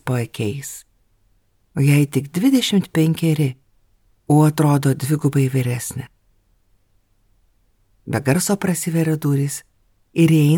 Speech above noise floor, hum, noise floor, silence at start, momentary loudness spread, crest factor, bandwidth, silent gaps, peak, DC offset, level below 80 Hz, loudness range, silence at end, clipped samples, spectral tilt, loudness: 43 dB; none; -60 dBFS; 0.05 s; 14 LU; 16 dB; 18.5 kHz; none; -4 dBFS; under 0.1%; -58 dBFS; 7 LU; 0 s; under 0.1%; -6 dB/octave; -19 LUFS